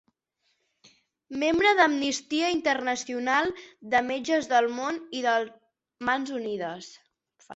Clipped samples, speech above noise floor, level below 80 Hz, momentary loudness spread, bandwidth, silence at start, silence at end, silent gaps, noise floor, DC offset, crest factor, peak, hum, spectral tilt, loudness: under 0.1%; 49 dB; -66 dBFS; 13 LU; 8.2 kHz; 1.3 s; 0 s; none; -75 dBFS; under 0.1%; 18 dB; -8 dBFS; none; -2.5 dB/octave; -26 LUFS